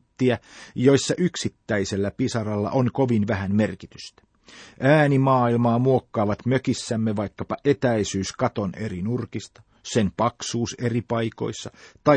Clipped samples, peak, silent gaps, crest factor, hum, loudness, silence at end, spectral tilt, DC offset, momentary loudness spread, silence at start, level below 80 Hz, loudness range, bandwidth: under 0.1%; -2 dBFS; none; 20 dB; none; -23 LUFS; 0 s; -6 dB/octave; under 0.1%; 12 LU; 0.2 s; -56 dBFS; 5 LU; 9.4 kHz